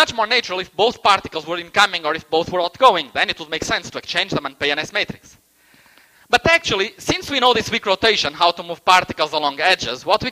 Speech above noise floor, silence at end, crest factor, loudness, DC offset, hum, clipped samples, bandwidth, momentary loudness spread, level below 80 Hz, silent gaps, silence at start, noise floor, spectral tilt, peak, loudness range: 34 dB; 0 s; 20 dB; -18 LUFS; under 0.1%; none; under 0.1%; 15.5 kHz; 8 LU; -48 dBFS; none; 0 s; -53 dBFS; -2.5 dB/octave; 0 dBFS; 4 LU